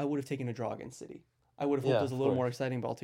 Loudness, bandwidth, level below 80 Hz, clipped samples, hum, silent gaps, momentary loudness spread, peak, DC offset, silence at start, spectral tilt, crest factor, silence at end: -33 LUFS; 16 kHz; -74 dBFS; under 0.1%; none; none; 18 LU; -18 dBFS; under 0.1%; 0 s; -7 dB/octave; 16 dB; 0.05 s